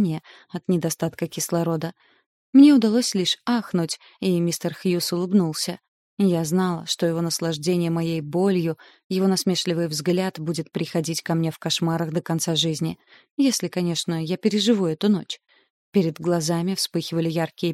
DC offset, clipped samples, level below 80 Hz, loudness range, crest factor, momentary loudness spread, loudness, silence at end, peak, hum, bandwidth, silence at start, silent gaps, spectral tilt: under 0.1%; under 0.1%; -66 dBFS; 4 LU; 18 dB; 8 LU; -23 LUFS; 0 s; -4 dBFS; none; 16 kHz; 0 s; 2.26-2.53 s, 5.88-6.17 s, 9.04-9.10 s, 13.31-13.37 s, 15.70-15.92 s; -5 dB/octave